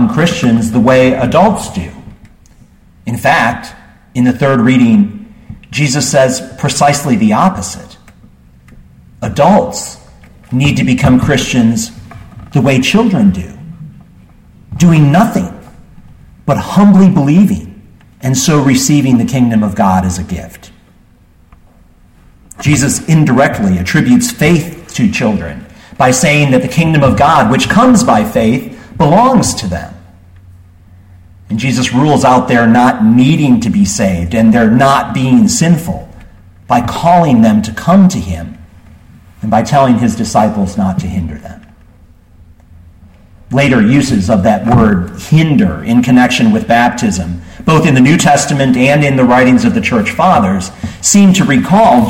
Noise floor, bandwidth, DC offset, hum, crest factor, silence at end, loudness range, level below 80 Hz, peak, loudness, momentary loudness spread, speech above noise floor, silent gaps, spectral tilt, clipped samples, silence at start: -44 dBFS; 16.5 kHz; under 0.1%; none; 10 dB; 0 s; 6 LU; -36 dBFS; 0 dBFS; -10 LUFS; 14 LU; 35 dB; none; -5.5 dB/octave; under 0.1%; 0 s